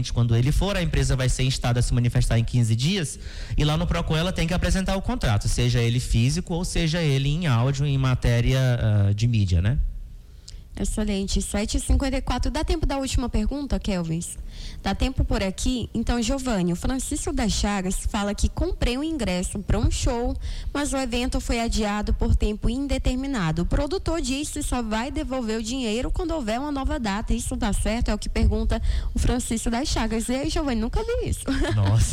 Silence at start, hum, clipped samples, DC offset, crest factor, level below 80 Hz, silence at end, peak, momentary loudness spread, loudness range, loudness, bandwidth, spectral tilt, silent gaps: 0 s; none; under 0.1%; under 0.1%; 14 dB; -28 dBFS; 0 s; -10 dBFS; 6 LU; 4 LU; -25 LUFS; 15.5 kHz; -5.5 dB/octave; none